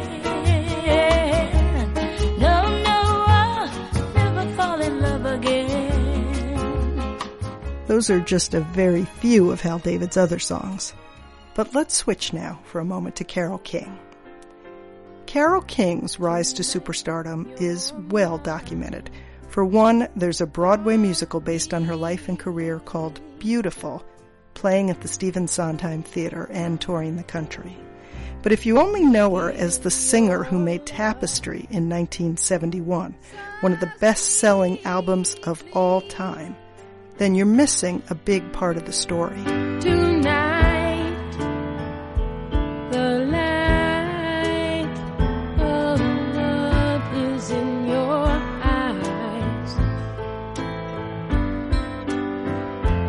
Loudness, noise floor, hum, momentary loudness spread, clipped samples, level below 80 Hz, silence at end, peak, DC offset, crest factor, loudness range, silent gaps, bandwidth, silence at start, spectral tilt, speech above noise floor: -22 LUFS; -44 dBFS; none; 12 LU; under 0.1%; -32 dBFS; 0 s; -4 dBFS; under 0.1%; 18 dB; 6 LU; none; 11.5 kHz; 0 s; -5 dB/octave; 23 dB